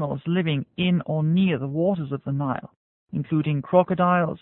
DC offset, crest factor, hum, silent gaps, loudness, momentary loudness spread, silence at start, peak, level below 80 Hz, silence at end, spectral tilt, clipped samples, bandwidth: under 0.1%; 18 dB; none; 2.76-3.06 s; -24 LUFS; 8 LU; 0 s; -4 dBFS; -58 dBFS; 0.05 s; -12 dB/octave; under 0.1%; 4 kHz